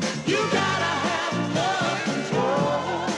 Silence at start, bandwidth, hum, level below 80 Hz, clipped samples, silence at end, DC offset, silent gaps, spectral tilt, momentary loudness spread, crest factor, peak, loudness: 0 s; 12 kHz; none; -64 dBFS; under 0.1%; 0 s; under 0.1%; none; -4.5 dB/octave; 3 LU; 14 dB; -10 dBFS; -24 LUFS